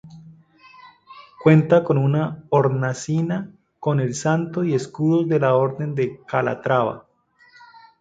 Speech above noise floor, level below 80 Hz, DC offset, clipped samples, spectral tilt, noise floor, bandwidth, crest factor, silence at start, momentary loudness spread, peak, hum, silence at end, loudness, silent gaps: 35 dB; -60 dBFS; under 0.1%; under 0.1%; -7.5 dB/octave; -55 dBFS; 9 kHz; 20 dB; 0.05 s; 9 LU; -2 dBFS; none; 1 s; -20 LUFS; none